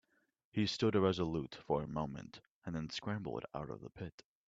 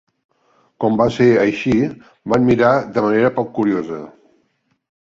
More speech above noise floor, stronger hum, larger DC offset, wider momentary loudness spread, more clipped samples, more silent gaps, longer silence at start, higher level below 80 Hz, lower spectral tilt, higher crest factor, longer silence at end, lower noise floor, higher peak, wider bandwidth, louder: second, 41 dB vs 49 dB; neither; neither; first, 17 LU vs 10 LU; neither; first, 2.51-2.62 s, 4.12-4.18 s vs none; second, 0.55 s vs 0.8 s; second, -64 dBFS vs -50 dBFS; about the same, -6.5 dB/octave vs -7.5 dB/octave; first, 22 dB vs 16 dB; second, 0.25 s vs 0.95 s; first, -80 dBFS vs -65 dBFS; second, -18 dBFS vs -2 dBFS; about the same, 7.8 kHz vs 7.6 kHz; second, -38 LUFS vs -16 LUFS